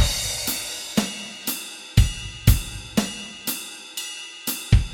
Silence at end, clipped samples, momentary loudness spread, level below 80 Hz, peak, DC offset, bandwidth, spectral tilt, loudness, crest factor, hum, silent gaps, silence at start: 0 s; under 0.1%; 10 LU; -28 dBFS; -2 dBFS; under 0.1%; 17 kHz; -4 dB/octave; -25 LUFS; 22 dB; none; none; 0 s